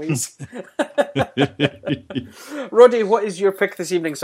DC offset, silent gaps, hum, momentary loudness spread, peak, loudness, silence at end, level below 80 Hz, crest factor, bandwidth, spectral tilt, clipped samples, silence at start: under 0.1%; none; none; 18 LU; 0 dBFS; -19 LUFS; 0 s; -58 dBFS; 20 dB; 15.5 kHz; -5 dB/octave; under 0.1%; 0 s